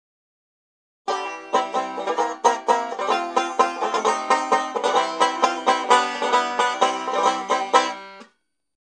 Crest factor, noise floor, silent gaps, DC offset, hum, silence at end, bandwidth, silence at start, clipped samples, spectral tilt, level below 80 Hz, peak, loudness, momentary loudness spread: 22 dB; -63 dBFS; none; under 0.1%; none; 0.6 s; 10.5 kHz; 1.1 s; under 0.1%; -1.5 dB/octave; -78 dBFS; 0 dBFS; -21 LUFS; 8 LU